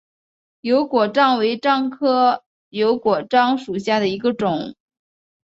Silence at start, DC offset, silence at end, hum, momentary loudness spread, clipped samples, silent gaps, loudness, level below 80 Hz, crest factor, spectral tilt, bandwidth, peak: 0.65 s; under 0.1%; 0.75 s; none; 9 LU; under 0.1%; 2.46-2.71 s; -19 LUFS; -64 dBFS; 18 dB; -6 dB/octave; 8 kHz; -2 dBFS